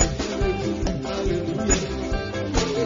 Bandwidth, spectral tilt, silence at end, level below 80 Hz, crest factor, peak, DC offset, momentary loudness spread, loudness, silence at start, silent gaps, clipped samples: 7.6 kHz; -4.5 dB/octave; 0 s; -30 dBFS; 20 dB; -4 dBFS; under 0.1%; 5 LU; -25 LUFS; 0 s; none; under 0.1%